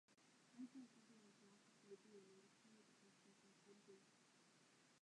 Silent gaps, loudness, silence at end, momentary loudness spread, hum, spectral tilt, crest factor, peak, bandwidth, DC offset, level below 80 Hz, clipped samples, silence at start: none; -64 LUFS; 0.05 s; 9 LU; none; -4 dB/octave; 20 dB; -48 dBFS; 10.5 kHz; under 0.1%; under -90 dBFS; under 0.1%; 0.1 s